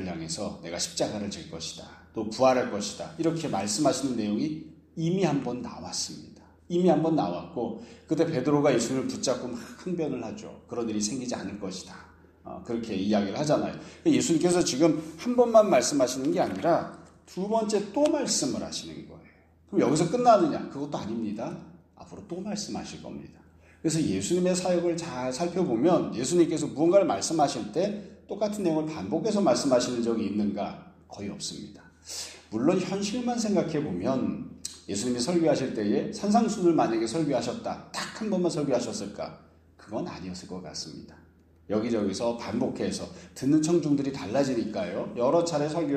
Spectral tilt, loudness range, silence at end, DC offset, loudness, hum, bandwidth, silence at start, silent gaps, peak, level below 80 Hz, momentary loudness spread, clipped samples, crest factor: -5 dB/octave; 8 LU; 0 s; under 0.1%; -27 LUFS; none; 14.5 kHz; 0 s; none; -8 dBFS; -62 dBFS; 15 LU; under 0.1%; 20 dB